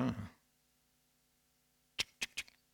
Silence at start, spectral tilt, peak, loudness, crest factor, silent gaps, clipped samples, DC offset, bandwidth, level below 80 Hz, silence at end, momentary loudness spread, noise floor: 0 s; -3.5 dB/octave; -20 dBFS; -42 LUFS; 24 dB; none; under 0.1%; under 0.1%; 20 kHz; -68 dBFS; 0.3 s; 10 LU; -76 dBFS